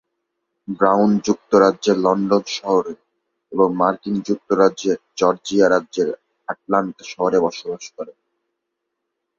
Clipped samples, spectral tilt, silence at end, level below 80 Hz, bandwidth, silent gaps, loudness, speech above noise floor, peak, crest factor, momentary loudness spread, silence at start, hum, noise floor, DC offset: under 0.1%; -5.5 dB/octave; 1.25 s; -62 dBFS; 7.4 kHz; none; -19 LUFS; 60 dB; -2 dBFS; 18 dB; 16 LU; 0.7 s; none; -78 dBFS; under 0.1%